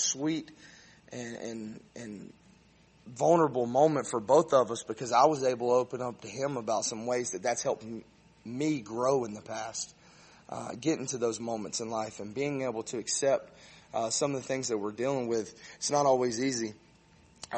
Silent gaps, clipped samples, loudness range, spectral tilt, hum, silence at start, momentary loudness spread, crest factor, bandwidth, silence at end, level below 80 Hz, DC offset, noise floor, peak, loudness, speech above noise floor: none; under 0.1%; 7 LU; -4 dB/octave; none; 0 s; 17 LU; 20 dB; 8.8 kHz; 0 s; -70 dBFS; under 0.1%; -61 dBFS; -10 dBFS; -30 LUFS; 31 dB